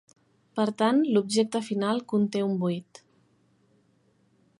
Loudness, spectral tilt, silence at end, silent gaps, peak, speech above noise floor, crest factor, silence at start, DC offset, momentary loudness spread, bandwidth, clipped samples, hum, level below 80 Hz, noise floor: -26 LUFS; -6 dB/octave; 1.75 s; none; -10 dBFS; 41 dB; 18 dB; 0.55 s; under 0.1%; 7 LU; 11.5 kHz; under 0.1%; none; -78 dBFS; -66 dBFS